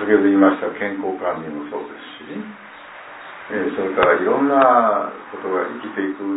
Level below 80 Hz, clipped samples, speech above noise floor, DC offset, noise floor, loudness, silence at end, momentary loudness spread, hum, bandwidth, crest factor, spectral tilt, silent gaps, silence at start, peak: -60 dBFS; under 0.1%; 20 dB; under 0.1%; -39 dBFS; -19 LUFS; 0 s; 22 LU; none; 4 kHz; 18 dB; -10 dB/octave; none; 0 s; 0 dBFS